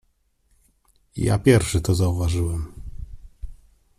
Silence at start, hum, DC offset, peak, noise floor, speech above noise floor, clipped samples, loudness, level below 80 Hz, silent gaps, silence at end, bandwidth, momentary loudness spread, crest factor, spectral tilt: 1.15 s; none; under 0.1%; -4 dBFS; -65 dBFS; 46 dB; under 0.1%; -21 LUFS; -38 dBFS; none; 0.45 s; 14.5 kHz; 26 LU; 20 dB; -6 dB/octave